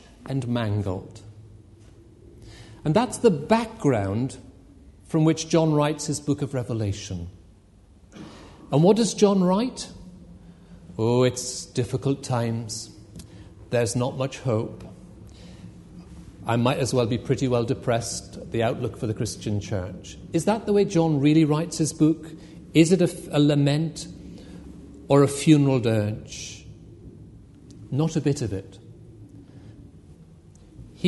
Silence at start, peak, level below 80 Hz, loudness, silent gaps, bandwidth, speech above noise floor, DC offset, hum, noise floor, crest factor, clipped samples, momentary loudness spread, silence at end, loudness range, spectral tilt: 0.2 s; -4 dBFS; -52 dBFS; -24 LUFS; none; 11.5 kHz; 30 dB; under 0.1%; none; -53 dBFS; 22 dB; under 0.1%; 24 LU; 0 s; 8 LU; -6 dB/octave